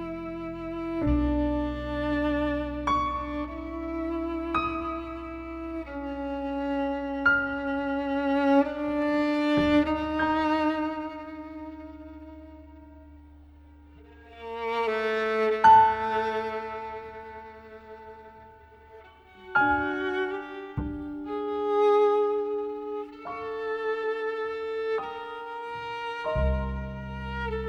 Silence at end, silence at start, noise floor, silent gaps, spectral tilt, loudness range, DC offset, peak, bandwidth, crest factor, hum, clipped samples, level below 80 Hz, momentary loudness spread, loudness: 0 s; 0 s; -51 dBFS; none; -7 dB/octave; 10 LU; under 0.1%; -8 dBFS; 7.6 kHz; 20 dB; none; under 0.1%; -42 dBFS; 17 LU; -27 LUFS